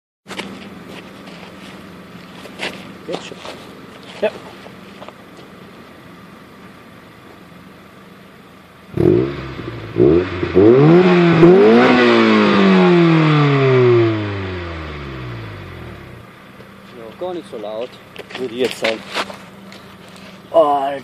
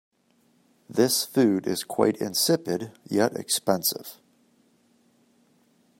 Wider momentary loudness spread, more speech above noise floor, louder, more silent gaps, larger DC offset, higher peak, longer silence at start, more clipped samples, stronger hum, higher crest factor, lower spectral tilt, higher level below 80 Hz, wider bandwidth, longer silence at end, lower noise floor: first, 27 LU vs 9 LU; second, 21 dB vs 40 dB; first, -14 LUFS vs -24 LUFS; neither; neither; first, 0 dBFS vs -6 dBFS; second, 0.3 s vs 0.9 s; neither; neither; second, 16 dB vs 22 dB; first, -7.5 dB/octave vs -3.5 dB/octave; first, -46 dBFS vs -74 dBFS; second, 11.5 kHz vs 16.5 kHz; second, 0 s vs 1.85 s; second, -42 dBFS vs -65 dBFS